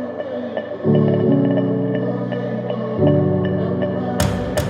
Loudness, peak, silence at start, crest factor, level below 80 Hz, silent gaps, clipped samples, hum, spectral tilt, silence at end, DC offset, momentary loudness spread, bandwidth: -19 LUFS; -4 dBFS; 0 s; 16 dB; -40 dBFS; none; under 0.1%; none; -7.5 dB/octave; 0 s; under 0.1%; 9 LU; 16 kHz